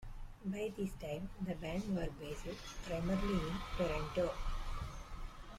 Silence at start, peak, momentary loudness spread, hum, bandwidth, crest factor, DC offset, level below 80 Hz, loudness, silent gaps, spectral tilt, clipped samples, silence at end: 0 s; -24 dBFS; 10 LU; none; 15.5 kHz; 16 dB; under 0.1%; -46 dBFS; -41 LUFS; none; -6 dB/octave; under 0.1%; 0 s